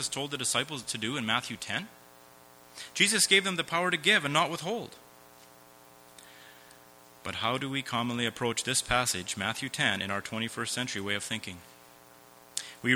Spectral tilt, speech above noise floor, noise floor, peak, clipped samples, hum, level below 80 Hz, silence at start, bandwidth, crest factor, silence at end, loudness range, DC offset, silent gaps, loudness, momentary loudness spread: -2 dB/octave; 25 dB; -55 dBFS; -6 dBFS; under 0.1%; none; -60 dBFS; 0 s; over 20 kHz; 26 dB; 0 s; 9 LU; under 0.1%; none; -29 LUFS; 15 LU